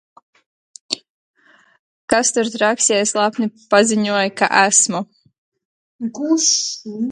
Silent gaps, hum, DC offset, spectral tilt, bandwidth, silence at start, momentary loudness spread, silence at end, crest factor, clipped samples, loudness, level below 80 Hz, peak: 1.09-1.34 s, 1.79-2.08 s, 5.38-5.52 s, 5.65-5.99 s; none; under 0.1%; -2 dB/octave; 11.5 kHz; 0.9 s; 13 LU; 0 s; 20 dB; under 0.1%; -16 LUFS; -64 dBFS; 0 dBFS